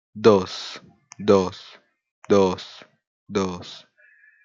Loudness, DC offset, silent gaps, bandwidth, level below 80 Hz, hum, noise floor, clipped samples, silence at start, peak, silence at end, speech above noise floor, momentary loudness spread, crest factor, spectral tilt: -22 LUFS; under 0.1%; 2.11-2.22 s, 3.07-3.27 s; 7.6 kHz; -66 dBFS; none; -56 dBFS; under 0.1%; 0.15 s; -2 dBFS; 0.65 s; 35 dB; 22 LU; 22 dB; -6 dB/octave